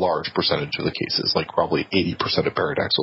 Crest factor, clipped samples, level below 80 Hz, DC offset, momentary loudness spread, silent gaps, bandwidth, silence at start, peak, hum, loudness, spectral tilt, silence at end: 18 dB; under 0.1%; -48 dBFS; under 0.1%; 2 LU; none; 6 kHz; 0 s; -4 dBFS; none; -22 LUFS; -7.5 dB/octave; 0 s